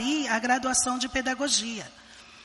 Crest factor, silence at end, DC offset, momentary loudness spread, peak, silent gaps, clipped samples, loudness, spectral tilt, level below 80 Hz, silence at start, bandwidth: 18 dB; 0 s; under 0.1%; 12 LU; -10 dBFS; none; under 0.1%; -25 LUFS; -1 dB/octave; -54 dBFS; 0 s; 11.5 kHz